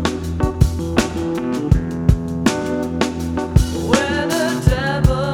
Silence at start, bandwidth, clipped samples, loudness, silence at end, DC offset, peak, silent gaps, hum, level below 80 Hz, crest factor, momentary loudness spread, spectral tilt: 0 s; 18.5 kHz; under 0.1%; -19 LUFS; 0 s; under 0.1%; 0 dBFS; none; none; -24 dBFS; 18 dB; 5 LU; -6 dB/octave